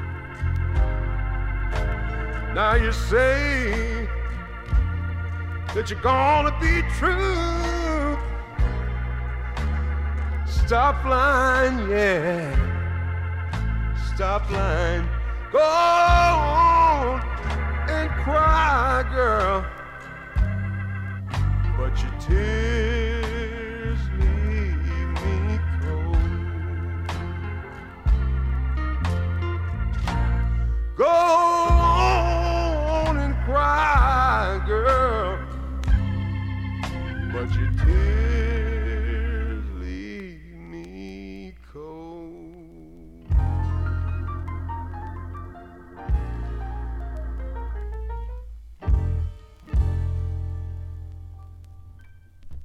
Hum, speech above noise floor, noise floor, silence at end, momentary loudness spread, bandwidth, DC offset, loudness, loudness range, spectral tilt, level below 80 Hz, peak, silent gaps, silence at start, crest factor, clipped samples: none; 27 dB; -46 dBFS; 0 s; 16 LU; 9.8 kHz; under 0.1%; -23 LUFS; 11 LU; -6.5 dB/octave; -26 dBFS; -4 dBFS; none; 0 s; 18 dB; under 0.1%